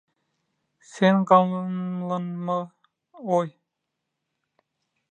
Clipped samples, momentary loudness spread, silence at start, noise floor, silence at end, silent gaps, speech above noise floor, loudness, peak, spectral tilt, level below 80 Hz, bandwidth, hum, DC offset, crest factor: under 0.1%; 14 LU; 0.95 s; -82 dBFS; 1.65 s; none; 59 dB; -23 LUFS; -2 dBFS; -7.5 dB/octave; -78 dBFS; 8.8 kHz; none; under 0.1%; 24 dB